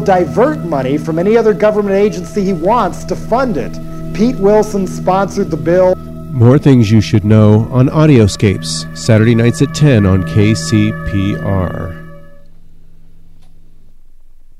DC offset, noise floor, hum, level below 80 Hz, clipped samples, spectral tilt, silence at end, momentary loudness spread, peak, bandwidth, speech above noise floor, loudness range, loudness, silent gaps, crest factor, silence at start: under 0.1%; -34 dBFS; none; -32 dBFS; 0.2%; -7 dB/octave; 0.3 s; 9 LU; 0 dBFS; 13.5 kHz; 23 dB; 7 LU; -12 LUFS; none; 12 dB; 0 s